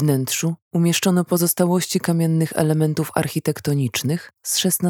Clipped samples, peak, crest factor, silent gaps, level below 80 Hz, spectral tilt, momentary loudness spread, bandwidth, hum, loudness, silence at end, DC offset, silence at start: under 0.1%; -2 dBFS; 18 dB; 0.62-0.71 s; -62 dBFS; -5 dB/octave; 5 LU; 19 kHz; none; -20 LUFS; 0 s; under 0.1%; 0 s